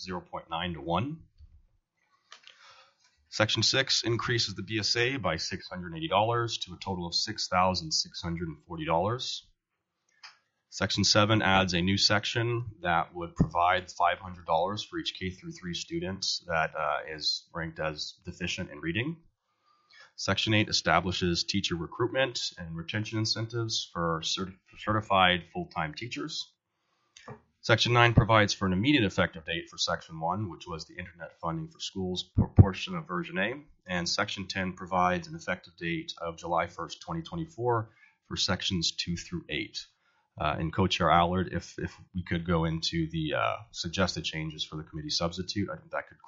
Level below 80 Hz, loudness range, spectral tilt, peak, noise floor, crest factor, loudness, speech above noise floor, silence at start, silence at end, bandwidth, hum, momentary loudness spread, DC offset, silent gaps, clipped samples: -50 dBFS; 6 LU; -3.5 dB/octave; -4 dBFS; -83 dBFS; 26 dB; -29 LUFS; 53 dB; 0 s; 0.25 s; 7.6 kHz; none; 14 LU; under 0.1%; none; under 0.1%